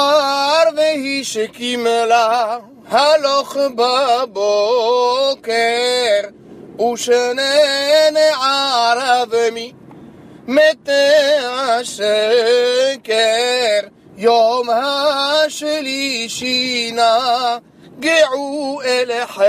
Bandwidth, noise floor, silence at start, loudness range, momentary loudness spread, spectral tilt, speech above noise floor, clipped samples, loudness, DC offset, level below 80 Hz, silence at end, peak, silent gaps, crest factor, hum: 15.5 kHz; -39 dBFS; 0 s; 2 LU; 7 LU; -1.5 dB/octave; 24 dB; under 0.1%; -15 LUFS; under 0.1%; -66 dBFS; 0 s; -2 dBFS; none; 14 dB; none